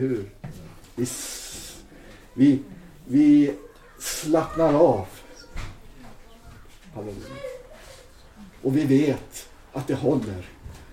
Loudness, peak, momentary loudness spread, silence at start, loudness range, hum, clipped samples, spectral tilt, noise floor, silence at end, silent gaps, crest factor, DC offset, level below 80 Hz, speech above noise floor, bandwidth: -23 LUFS; -6 dBFS; 24 LU; 0 s; 14 LU; none; under 0.1%; -6 dB/octave; -47 dBFS; 0.1 s; none; 20 dB; under 0.1%; -46 dBFS; 25 dB; 16 kHz